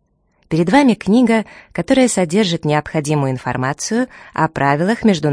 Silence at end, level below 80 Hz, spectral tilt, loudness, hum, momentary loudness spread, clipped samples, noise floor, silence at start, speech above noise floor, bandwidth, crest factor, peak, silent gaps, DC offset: 0 s; -48 dBFS; -5.5 dB/octave; -16 LUFS; none; 8 LU; under 0.1%; -60 dBFS; 0.5 s; 44 dB; 10.5 kHz; 16 dB; 0 dBFS; none; under 0.1%